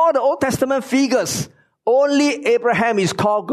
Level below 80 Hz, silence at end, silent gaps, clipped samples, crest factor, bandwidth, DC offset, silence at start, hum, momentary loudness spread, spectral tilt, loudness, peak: -56 dBFS; 0 s; none; under 0.1%; 12 dB; 13.5 kHz; under 0.1%; 0 s; none; 7 LU; -4.5 dB/octave; -18 LUFS; -6 dBFS